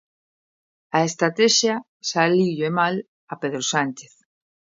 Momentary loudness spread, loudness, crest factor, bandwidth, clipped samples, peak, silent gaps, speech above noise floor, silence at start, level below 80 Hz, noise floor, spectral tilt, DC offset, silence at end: 13 LU; -21 LUFS; 20 dB; 7.8 kHz; under 0.1%; -2 dBFS; 1.88-2.00 s, 3.08-3.27 s; over 69 dB; 0.95 s; -72 dBFS; under -90 dBFS; -3.5 dB/octave; under 0.1%; 0.75 s